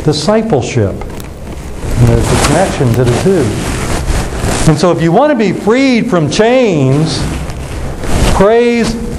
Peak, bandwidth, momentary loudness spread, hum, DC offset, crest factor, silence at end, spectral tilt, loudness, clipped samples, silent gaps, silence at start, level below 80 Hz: 0 dBFS; 13.5 kHz; 13 LU; none; under 0.1%; 10 dB; 0 s; -5.5 dB/octave; -11 LUFS; under 0.1%; none; 0 s; -22 dBFS